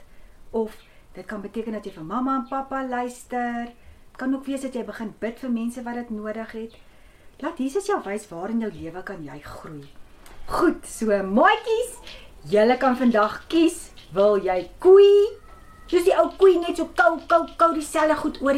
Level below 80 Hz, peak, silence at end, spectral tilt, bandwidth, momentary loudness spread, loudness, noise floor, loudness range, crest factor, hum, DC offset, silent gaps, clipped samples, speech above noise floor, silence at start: -48 dBFS; -4 dBFS; 0 s; -5 dB/octave; 15 kHz; 18 LU; -22 LUFS; -49 dBFS; 12 LU; 18 dB; none; under 0.1%; none; under 0.1%; 27 dB; 0 s